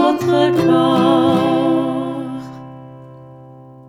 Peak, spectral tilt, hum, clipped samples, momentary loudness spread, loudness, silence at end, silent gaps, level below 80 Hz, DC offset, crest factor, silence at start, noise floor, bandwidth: -2 dBFS; -7 dB/octave; none; under 0.1%; 21 LU; -15 LUFS; 0.3 s; none; -58 dBFS; under 0.1%; 14 dB; 0 s; -39 dBFS; 14 kHz